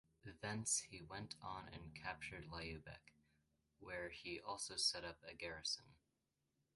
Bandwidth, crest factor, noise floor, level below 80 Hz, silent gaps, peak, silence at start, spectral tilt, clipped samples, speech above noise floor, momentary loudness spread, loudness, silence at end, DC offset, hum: 11.5 kHz; 24 dB; -88 dBFS; -70 dBFS; none; -26 dBFS; 0.25 s; -2 dB/octave; under 0.1%; 39 dB; 15 LU; -46 LUFS; 0.8 s; under 0.1%; none